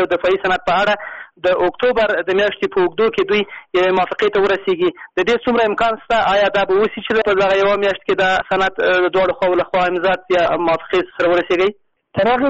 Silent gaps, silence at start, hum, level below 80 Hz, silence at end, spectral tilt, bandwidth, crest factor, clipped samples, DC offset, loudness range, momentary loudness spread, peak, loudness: none; 0 s; none; -46 dBFS; 0 s; -2 dB/octave; 8 kHz; 8 dB; under 0.1%; under 0.1%; 1 LU; 4 LU; -8 dBFS; -16 LUFS